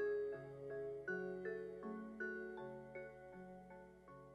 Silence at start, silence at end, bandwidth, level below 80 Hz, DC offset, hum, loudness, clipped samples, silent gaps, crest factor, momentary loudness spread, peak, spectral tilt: 0 s; 0 s; 8.4 kHz; -76 dBFS; under 0.1%; none; -49 LUFS; under 0.1%; none; 16 dB; 13 LU; -32 dBFS; -8 dB/octave